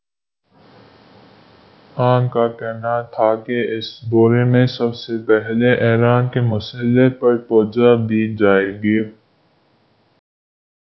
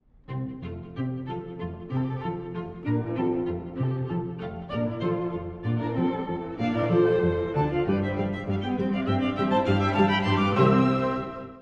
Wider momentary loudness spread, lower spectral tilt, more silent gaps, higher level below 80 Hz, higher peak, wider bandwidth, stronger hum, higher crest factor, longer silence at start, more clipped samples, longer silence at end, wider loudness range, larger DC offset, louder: second, 8 LU vs 13 LU; about the same, -9.5 dB/octave vs -8.5 dB/octave; neither; about the same, -54 dBFS vs -50 dBFS; first, 0 dBFS vs -6 dBFS; second, 6 kHz vs 7.8 kHz; neither; about the same, 18 dB vs 20 dB; first, 1.95 s vs 0.3 s; neither; first, 1.7 s vs 0 s; about the same, 5 LU vs 7 LU; neither; first, -17 LUFS vs -27 LUFS